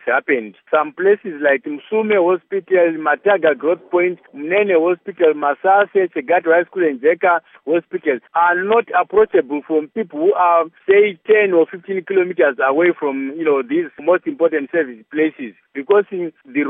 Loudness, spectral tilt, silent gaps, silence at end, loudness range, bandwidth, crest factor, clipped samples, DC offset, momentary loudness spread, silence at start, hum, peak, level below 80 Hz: -17 LUFS; -3.5 dB/octave; none; 0 s; 2 LU; 3.8 kHz; 14 dB; under 0.1%; under 0.1%; 7 LU; 0.05 s; none; -2 dBFS; -68 dBFS